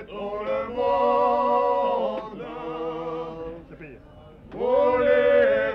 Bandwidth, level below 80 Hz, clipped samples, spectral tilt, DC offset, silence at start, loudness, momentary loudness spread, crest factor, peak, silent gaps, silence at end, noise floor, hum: 5.8 kHz; -52 dBFS; under 0.1%; -7 dB/octave; under 0.1%; 0 s; -23 LUFS; 19 LU; 14 dB; -10 dBFS; none; 0 s; -47 dBFS; none